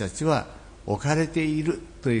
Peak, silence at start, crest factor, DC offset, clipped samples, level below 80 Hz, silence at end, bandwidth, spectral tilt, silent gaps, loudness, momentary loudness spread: -10 dBFS; 0 s; 16 dB; under 0.1%; under 0.1%; -48 dBFS; 0 s; 10.5 kHz; -6 dB/octave; none; -26 LUFS; 9 LU